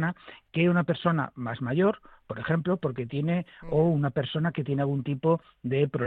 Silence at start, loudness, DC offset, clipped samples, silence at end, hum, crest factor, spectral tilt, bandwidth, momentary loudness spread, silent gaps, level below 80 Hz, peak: 0 s; -28 LUFS; under 0.1%; under 0.1%; 0 s; none; 18 dB; -10 dB/octave; 4.2 kHz; 9 LU; none; -58 dBFS; -8 dBFS